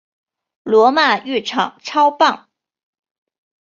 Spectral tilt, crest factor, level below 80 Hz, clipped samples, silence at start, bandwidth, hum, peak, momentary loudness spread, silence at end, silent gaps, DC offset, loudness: -3.5 dB/octave; 18 dB; -68 dBFS; under 0.1%; 0.65 s; 7.4 kHz; none; 0 dBFS; 9 LU; 1.25 s; none; under 0.1%; -15 LUFS